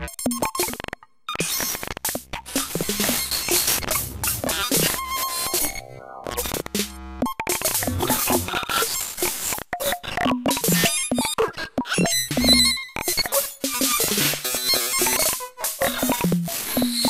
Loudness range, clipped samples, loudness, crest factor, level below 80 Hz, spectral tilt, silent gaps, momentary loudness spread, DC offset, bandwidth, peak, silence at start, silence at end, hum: 5 LU; under 0.1%; -22 LUFS; 20 dB; -44 dBFS; -2 dB/octave; none; 8 LU; under 0.1%; 16 kHz; -4 dBFS; 0 s; 0 s; none